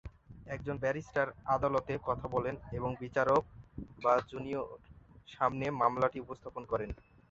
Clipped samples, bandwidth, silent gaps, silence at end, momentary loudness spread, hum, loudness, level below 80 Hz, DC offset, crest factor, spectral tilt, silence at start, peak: under 0.1%; 7.8 kHz; none; 0.35 s; 19 LU; none; -34 LUFS; -56 dBFS; under 0.1%; 20 dB; -7 dB/octave; 0.05 s; -14 dBFS